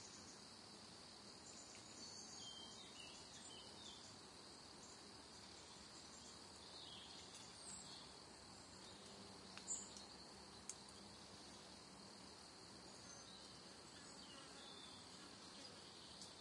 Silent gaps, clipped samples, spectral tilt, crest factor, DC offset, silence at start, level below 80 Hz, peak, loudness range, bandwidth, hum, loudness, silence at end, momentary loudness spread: none; under 0.1%; -2 dB/octave; 28 dB; under 0.1%; 0 s; -80 dBFS; -30 dBFS; 3 LU; 12 kHz; none; -56 LUFS; 0 s; 5 LU